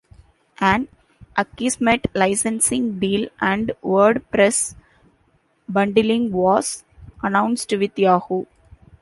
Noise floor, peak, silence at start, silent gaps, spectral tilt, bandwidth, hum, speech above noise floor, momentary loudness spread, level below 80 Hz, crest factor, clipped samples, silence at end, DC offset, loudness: -62 dBFS; -2 dBFS; 0.6 s; none; -4 dB/octave; 12 kHz; none; 43 dB; 10 LU; -50 dBFS; 18 dB; under 0.1%; 0.55 s; under 0.1%; -19 LUFS